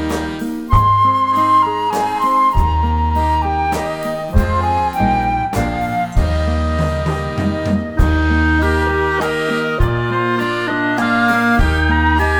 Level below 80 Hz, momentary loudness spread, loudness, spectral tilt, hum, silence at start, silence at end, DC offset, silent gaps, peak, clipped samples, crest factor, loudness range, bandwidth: -22 dBFS; 6 LU; -16 LUFS; -6.5 dB/octave; none; 0 s; 0 s; under 0.1%; none; -2 dBFS; under 0.1%; 14 dB; 3 LU; 18.5 kHz